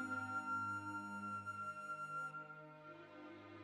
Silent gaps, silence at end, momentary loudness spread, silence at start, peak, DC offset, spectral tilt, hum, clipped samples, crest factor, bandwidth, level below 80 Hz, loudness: none; 0 s; 14 LU; 0 s; -34 dBFS; under 0.1%; -5.5 dB/octave; 50 Hz at -70 dBFS; under 0.1%; 14 dB; 13 kHz; under -90 dBFS; -46 LUFS